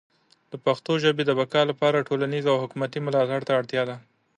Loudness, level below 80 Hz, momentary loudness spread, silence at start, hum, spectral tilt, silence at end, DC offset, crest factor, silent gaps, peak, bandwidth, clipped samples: -24 LUFS; -72 dBFS; 7 LU; 0.5 s; none; -6 dB/octave; 0.4 s; under 0.1%; 18 dB; none; -8 dBFS; 9.4 kHz; under 0.1%